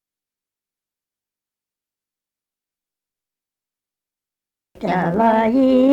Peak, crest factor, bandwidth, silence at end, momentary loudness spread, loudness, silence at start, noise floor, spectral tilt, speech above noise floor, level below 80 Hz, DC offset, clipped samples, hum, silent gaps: -4 dBFS; 18 dB; 7.2 kHz; 0 s; 8 LU; -16 LUFS; 4.8 s; -89 dBFS; -8.5 dB/octave; 75 dB; -56 dBFS; under 0.1%; under 0.1%; 50 Hz at -70 dBFS; none